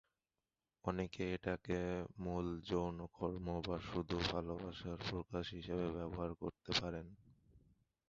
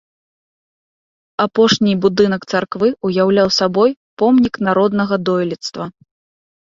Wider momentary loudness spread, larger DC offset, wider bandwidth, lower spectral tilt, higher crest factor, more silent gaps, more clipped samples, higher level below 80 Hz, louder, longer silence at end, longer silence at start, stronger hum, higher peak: second, 7 LU vs 10 LU; neither; about the same, 7.6 kHz vs 7.6 kHz; about the same, -4.5 dB/octave vs -5.5 dB/octave; first, 22 dB vs 16 dB; second, none vs 3.96-4.17 s; neither; about the same, -58 dBFS vs -54 dBFS; second, -43 LUFS vs -15 LUFS; second, 0.5 s vs 0.75 s; second, 0.85 s vs 1.4 s; neither; second, -22 dBFS vs 0 dBFS